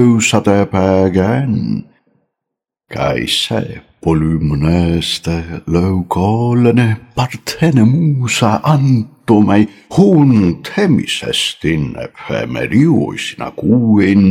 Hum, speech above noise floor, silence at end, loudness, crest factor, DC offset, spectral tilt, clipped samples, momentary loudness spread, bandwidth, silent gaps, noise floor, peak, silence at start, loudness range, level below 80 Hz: none; 68 dB; 0 s; -13 LUFS; 12 dB; under 0.1%; -6 dB/octave; under 0.1%; 10 LU; 15.5 kHz; none; -80 dBFS; 0 dBFS; 0 s; 5 LU; -36 dBFS